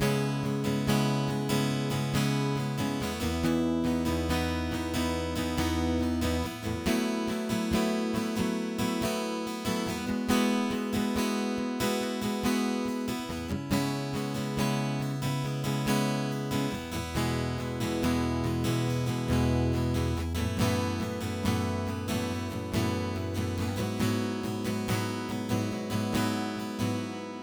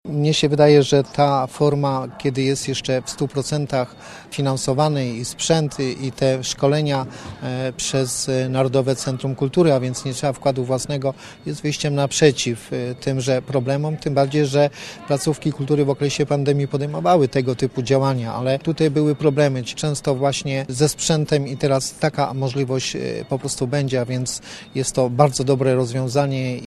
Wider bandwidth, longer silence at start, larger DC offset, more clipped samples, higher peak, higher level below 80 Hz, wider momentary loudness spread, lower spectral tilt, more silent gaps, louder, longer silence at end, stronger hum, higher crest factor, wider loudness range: first, over 20 kHz vs 13 kHz; about the same, 0 s vs 0.05 s; neither; neither; second, -12 dBFS vs 0 dBFS; about the same, -46 dBFS vs -50 dBFS; second, 5 LU vs 8 LU; about the same, -5.5 dB/octave vs -5.5 dB/octave; neither; second, -30 LUFS vs -20 LUFS; about the same, 0 s vs 0 s; neither; about the same, 18 dB vs 20 dB; about the same, 2 LU vs 3 LU